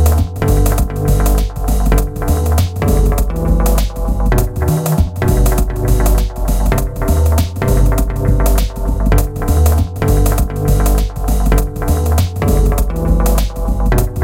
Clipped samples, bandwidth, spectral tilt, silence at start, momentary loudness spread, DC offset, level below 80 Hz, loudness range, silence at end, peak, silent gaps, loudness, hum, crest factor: under 0.1%; 17 kHz; -6.5 dB/octave; 0 s; 4 LU; under 0.1%; -14 dBFS; 1 LU; 0 s; 0 dBFS; none; -15 LUFS; none; 12 dB